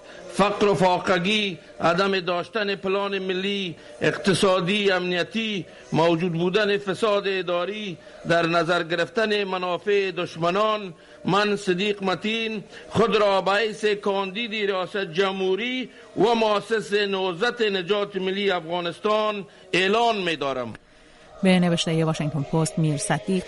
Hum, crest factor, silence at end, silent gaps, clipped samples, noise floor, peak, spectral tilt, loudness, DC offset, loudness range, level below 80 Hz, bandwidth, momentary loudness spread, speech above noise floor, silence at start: none; 18 dB; 0 s; none; under 0.1%; -50 dBFS; -6 dBFS; -5 dB/octave; -23 LUFS; under 0.1%; 2 LU; -58 dBFS; 11.5 kHz; 8 LU; 27 dB; 0 s